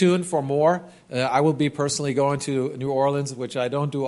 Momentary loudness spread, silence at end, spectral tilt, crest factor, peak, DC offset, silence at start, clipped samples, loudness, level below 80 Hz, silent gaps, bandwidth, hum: 7 LU; 0 s; -5.5 dB/octave; 16 dB; -6 dBFS; under 0.1%; 0 s; under 0.1%; -23 LUFS; -64 dBFS; none; 11.5 kHz; none